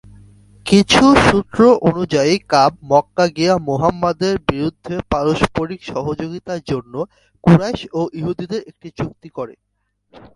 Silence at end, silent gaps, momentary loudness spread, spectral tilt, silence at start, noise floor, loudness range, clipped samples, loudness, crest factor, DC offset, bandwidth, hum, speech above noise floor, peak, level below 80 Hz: 0.85 s; none; 16 LU; -5.5 dB/octave; 0.65 s; -51 dBFS; 7 LU; under 0.1%; -16 LUFS; 16 dB; under 0.1%; 11.5 kHz; none; 35 dB; 0 dBFS; -40 dBFS